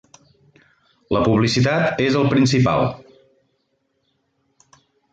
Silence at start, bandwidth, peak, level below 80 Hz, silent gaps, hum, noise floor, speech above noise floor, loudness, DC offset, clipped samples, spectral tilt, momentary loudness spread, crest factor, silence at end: 1.1 s; 9 kHz; -6 dBFS; -48 dBFS; none; none; -69 dBFS; 52 dB; -18 LUFS; under 0.1%; under 0.1%; -6 dB/octave; 7 LU; 16 dB; 2.15 s